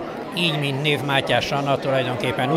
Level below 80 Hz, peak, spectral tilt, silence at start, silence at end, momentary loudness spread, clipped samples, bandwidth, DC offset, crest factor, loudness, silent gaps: -54 dBFS; -4 dBFS; -5.5 dB/octave; 0 s; 0 s; 3 LU; under 0.1%; 16 kHz; under 0.1%; 18 dB; -21 LUFS; none